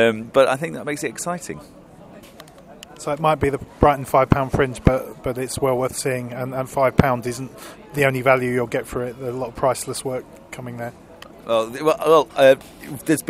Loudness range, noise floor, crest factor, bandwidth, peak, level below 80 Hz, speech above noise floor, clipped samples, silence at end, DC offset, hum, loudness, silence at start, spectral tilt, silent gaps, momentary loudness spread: 5 LU; -43 dBFS; 20 dB; 16 kHz; 0 dBFS; -40 dBFS; 23 dB; under 0.1%; 0.05 s; under 0.1%; none; -20 LUFS; 0 s; -5.5 dB/octave; none; 16 LU